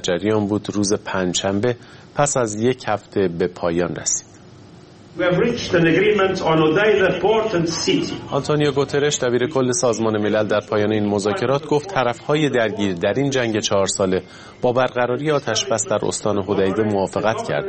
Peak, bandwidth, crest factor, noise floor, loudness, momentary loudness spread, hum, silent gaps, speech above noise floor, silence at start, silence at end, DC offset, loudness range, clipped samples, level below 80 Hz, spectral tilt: -2 dBFS; 8.8 kHz; 18 dB; -43 dBFS; -19 LUFS; 5 LU; none; none; 24 dB; 0 s; 0 s; under 0.1%; 4 LU; under 0.1%; -50 dBFS; -4.5 dB/octave